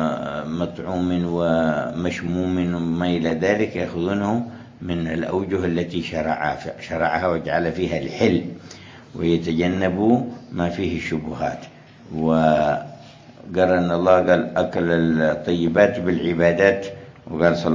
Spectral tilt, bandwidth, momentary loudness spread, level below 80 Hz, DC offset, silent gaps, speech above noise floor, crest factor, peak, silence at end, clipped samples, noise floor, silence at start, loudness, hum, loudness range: -7 dB/octave; 7.6 kHz; 11 LU; -44 dBFS; under 0.1%; none; 23 dB; 20 dB; -2 dBFS; 0 s; under 0.1%; -43 dBFS; 0 s; -21 LUFS; none; 4 LU